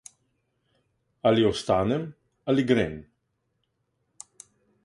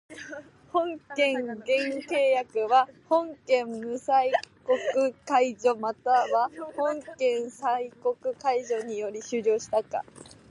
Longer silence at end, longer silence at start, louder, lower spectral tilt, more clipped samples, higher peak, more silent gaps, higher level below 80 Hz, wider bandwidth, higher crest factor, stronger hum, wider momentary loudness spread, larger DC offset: first, 1.85 s vs 0.25 s; first, 1.25 s vs 0.1 s; about the same, -25 LUFS vs -27 LUFS; first, -6 dB/octave vs -3.5 dB/octave; neither; about the same, -8 dBFS vs -10 dBFS; neither; first, -54 dBFS vs -72 dBFS; about the same, 11.5 kHz vs 11.5 kHz; about the same, 22 dB vs 18 dB; neither; first, 21 LU vs 10 LU; neither